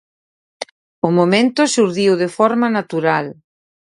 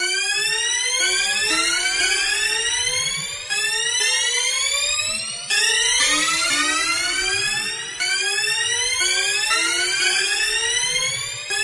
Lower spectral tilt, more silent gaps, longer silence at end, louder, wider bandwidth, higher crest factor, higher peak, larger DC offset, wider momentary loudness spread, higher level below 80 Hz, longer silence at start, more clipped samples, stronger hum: first, -5 dB/octave vs 1.5 dB/octave; first, 0.71-1.02 s vs none; first, 0.65 s vs 0 s; about the same, -16 LUFS vs -18 LUFS; about the same, 11.5 kHz vs 11.5 kHz; about the same, 16 dB vs 16 dB; first, 0 dBFS vs -6 dBFS; neither; first, 18 LU vs 5 LU; second, -64 dBFS vs -52 dBFS; first, 0.6 s vs 0 s; neither; neither